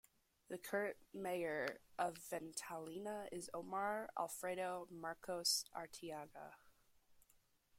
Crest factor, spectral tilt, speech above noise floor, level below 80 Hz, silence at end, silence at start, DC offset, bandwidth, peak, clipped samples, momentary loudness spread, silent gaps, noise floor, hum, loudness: 22 dB; -2.5 dB/octave; 30 dB; -80 dBFS; 0.6 s; 0.5 s; under 0.1%; 16.5 kHz; -26 dBFS; under 0.1%; 10 LU; none; -76 dBFS; none; -45 LUFS